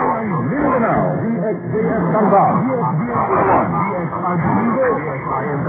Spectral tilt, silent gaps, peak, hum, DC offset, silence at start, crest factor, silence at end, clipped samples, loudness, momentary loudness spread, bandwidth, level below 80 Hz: -13 dB/octave; none; -2 dBFS; none; under 0.1%; 0 s; 14 dB; 0 s; under 0.1%; -17 LUFS; 7 LU; 3.6 kHz; -46 dBFS